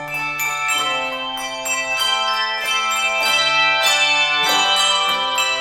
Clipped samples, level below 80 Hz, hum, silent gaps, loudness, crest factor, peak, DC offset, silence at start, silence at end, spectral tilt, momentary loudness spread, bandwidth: under 0.1%; -56 dBFS; none; none; -16 LUFS; 14 dB; -4 dBFS; under 0.1%; 0 s; 0 s; 0.5 dB/octave; 7 LU; 18 kHz